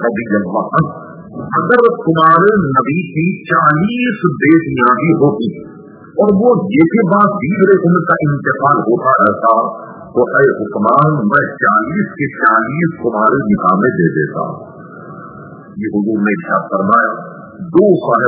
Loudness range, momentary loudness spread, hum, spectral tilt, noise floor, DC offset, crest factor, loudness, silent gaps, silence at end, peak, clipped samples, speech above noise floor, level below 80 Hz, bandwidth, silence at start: 5 LU; 13 LU; none; -11 dB/octave; -33 dBFS; under 0.1%; 12 dB; -12 LUFS; none; 0 s; 0 dBFS; 0.1%; 21 dB; -50 dBFS; 4 kHz; 0 s